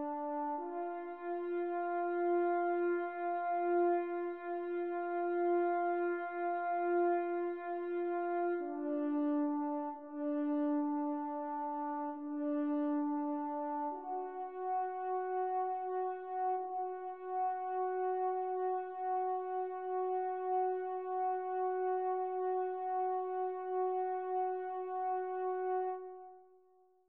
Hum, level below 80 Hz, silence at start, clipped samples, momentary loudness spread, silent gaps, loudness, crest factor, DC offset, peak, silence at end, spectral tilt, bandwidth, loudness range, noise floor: none; under -90 dBFS; 0 s; under 0.1%; 7 LU; none; -37 LUFS; 12 dB; under 0.1%; -24 dBFS; 0.65 s; -3.5 dB/octave; 4.1 kHz; 3 LU; -68 dBFS